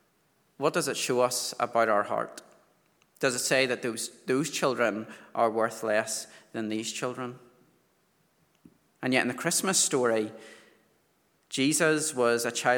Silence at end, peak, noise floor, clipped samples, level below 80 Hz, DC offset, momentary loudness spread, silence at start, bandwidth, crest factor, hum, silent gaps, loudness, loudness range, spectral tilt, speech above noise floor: 0 s; -8 dBFS; -69 dBFS; under 0.1%; -82 dBFS; under 0.1%; 12 LU; 0.6 s; over 20 kHz; 22 dB; none; none; -28 LUFS; 6 LU; -3 dB/octave; 41 dB